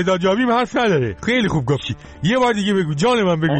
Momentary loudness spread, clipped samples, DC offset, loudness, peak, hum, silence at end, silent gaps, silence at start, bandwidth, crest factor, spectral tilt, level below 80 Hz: 5 LU; under 0.1%; under 0.1%; -18 LUFS; -6 dBFS; none; 0 s; none; 0 s; 8.8 kHz; 12 dB; -6 dB/octave; -44 dBFS